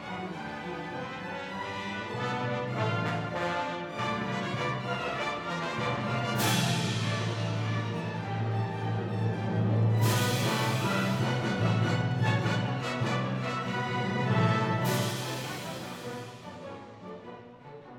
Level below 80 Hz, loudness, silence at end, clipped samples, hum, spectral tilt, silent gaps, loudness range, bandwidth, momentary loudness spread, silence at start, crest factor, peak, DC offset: -64 dBFS; -30 LUFS; 0 s; under 0.1%; none; -5.5 dB/octave; none; 5 LU; 19 kHz; 12 LU; 0 s; 16 dB; -14 dBFS; under 0.1%